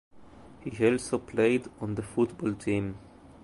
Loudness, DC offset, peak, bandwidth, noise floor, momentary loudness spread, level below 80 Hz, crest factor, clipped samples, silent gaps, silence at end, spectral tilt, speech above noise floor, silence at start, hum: -29 LUFS; under 0.1%; -12 dBFS; 11.5 kHz; -50 dBFS; 13 LU; -56 dBFS; 18 dB; under 0.1%; none; 0.1 s; -6.5 dB/octave; 21 dB; 0.15 s; none